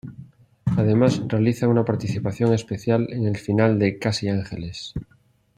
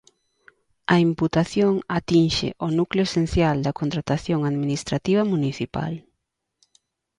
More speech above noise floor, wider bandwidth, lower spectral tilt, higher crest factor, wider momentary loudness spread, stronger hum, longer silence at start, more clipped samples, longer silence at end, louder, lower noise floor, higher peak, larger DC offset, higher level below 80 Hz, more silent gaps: second, 38 dB vs 57 dB; about the same, 10 kHz vs 11 kHz; about the same, -7 dB/octave vs -6.5 dB/octave; about the same, 18 dB vs 18 dB; first, 13 LU vs 8 LU; neither; second, 0.05 s vs 0.9 s; neither; second, 0.55 s vs 1.2 s; about the same, -22 LUFS vs -22 LUFS; second, -60 dBFS vs -78 dBFS; about the same, -4 dBFS vs -6 dBFS; neither; second, -52 dBFS vs -44 dBFS; neither